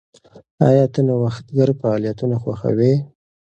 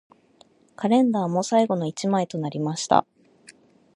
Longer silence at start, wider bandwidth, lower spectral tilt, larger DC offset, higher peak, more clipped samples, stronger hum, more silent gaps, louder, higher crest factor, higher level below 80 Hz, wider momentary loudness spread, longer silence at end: second, 0.35 s vs 0.8 s; second, 8.2 kHz vs 11 kHz; first, -9.5 dB/octave vs -5.5 dB/octave; neither; about the same, 0 dBFS vs -2 dBFS; neither; neither; first, 0.51-0.58 s vs none; first, -18 LUFS vs -23 LUFS; second, 18 dB vs 24 dB; first, -54 dBFS vs -68 dBFS; about the same, 7 LU vs 8 LU; about the same, 0.55 s vs 0.45 s